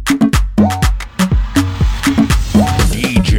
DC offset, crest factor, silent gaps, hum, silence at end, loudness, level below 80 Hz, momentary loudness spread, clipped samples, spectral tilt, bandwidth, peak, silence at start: under 0.1%; 12 dB; none; none; 0 s; -14 LUFS; -18 dBFS; 4 LU; under 0.1%; -5.5 dB/octave; 17 kHz; 0 dBFS; 0 s